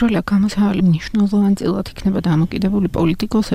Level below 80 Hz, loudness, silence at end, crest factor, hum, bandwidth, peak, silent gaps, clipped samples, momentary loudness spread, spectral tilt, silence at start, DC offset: -36 dBFS; -17 LUFS; 0 s; 8 dB; none; 14.5 kHz; -8 dBFS; none; under 0.1%; 4 LU; -7.5 dB/octave; 0 s; under 0.1%